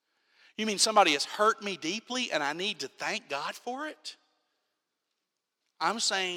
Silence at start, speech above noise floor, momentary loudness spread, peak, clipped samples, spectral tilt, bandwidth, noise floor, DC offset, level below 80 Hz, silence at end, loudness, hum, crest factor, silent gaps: 0.6 s; 55 dB; 14 LU; -10 dBFS; under 0.1%; -1.5 dB/octave; 16 kHz; -85 dBFS; under 0.1%; -86 dBFS; 0 s; -29 LUFS; none; 22 dB; none